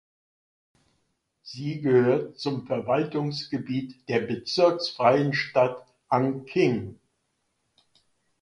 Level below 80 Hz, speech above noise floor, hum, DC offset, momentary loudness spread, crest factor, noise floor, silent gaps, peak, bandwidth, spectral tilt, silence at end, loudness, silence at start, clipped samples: -66 dBFS; 51 dB; none; under 0.1%; 11 LU; 20 dB; -75 dBFS; none; -6 dBFS; 10.5 kHz; -6.5 dB/octave; 1.45 s; -25 LUFS; 1.45 s; under 0.1%